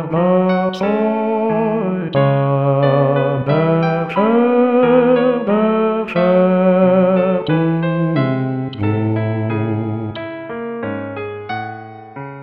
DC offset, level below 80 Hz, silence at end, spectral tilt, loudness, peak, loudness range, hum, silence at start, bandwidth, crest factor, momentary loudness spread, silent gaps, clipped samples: 0.2%; -58 dBFS; 0 s; -10 dB/octave; -16 LUFS; -2 dBFS; 8 LU; none; 0 s; 6 kHz; 12 dB; 13 LU; none; under 0.1%